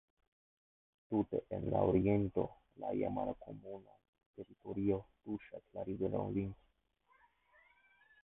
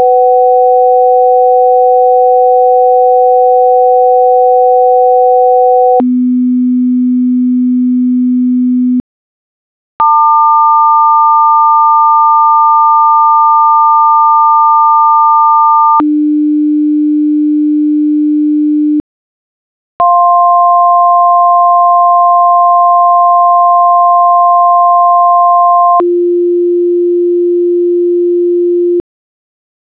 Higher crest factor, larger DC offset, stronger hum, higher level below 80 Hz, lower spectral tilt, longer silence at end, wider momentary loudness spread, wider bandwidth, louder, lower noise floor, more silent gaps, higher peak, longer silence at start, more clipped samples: first, 22 dB vs 6 dB; second, under 0.1% vs 0.4%; neither; about the same, -60 dBFS vs -58 dBFS; second, -7.5 dB/octave vs -10.5 dB/octave; first, 1.7 s vs 1 s; first, 19 LU vs 4 LU; about the same, 3.9 kHz vs 4 kHz; second, -38 LUFS vs -7 LUFS; second, -75 dBFS vs under -90 dBFS; second, 4.09-4.13 s, 4.26-4.34 s vs 9.00-10.00 s, 19.00-20.00 s; second, -18 dBFS vs 0 dBFS; first, 1.1 s vs 0 s; neither